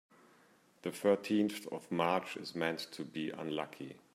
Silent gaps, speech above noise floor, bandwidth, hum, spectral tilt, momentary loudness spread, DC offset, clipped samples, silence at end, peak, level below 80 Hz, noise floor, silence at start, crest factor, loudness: none; 30 dB; 16 kHz; none; -5.5 dB/octave; 12 LU; under 0.1%; under 0.1%; 0.15 s; -16 dBFS; -82 dBFS; -67 dBFS; 0.85 s; 22 dB; -36 LUFS